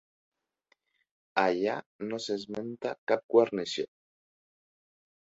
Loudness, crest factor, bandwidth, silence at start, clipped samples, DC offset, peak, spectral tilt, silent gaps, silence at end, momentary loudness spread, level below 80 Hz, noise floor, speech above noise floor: -30 LUFS; 24 dB; 8 kHz; 1.35 s; under 0.1%; under 0.1%; -10 dBFS; -4.5 dB/octave; 1.86-1.99 s, 2.98-3.07 s, 3.24-3.29 s; 1.45 s; 12 LU; -76 dBFS; -74 dBFS; 44 dB